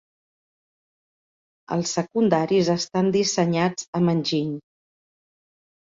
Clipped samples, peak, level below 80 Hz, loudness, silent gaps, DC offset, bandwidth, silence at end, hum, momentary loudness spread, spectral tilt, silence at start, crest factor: under 0.1%; -4 dBFS; -64 dBFS; -22 LUFS; 3.88-3.93 s; under 0.1%; 7.8 kHz; 1.35 s; none; 6 LU; -5 dB/octave; 1.7 s; 20 dB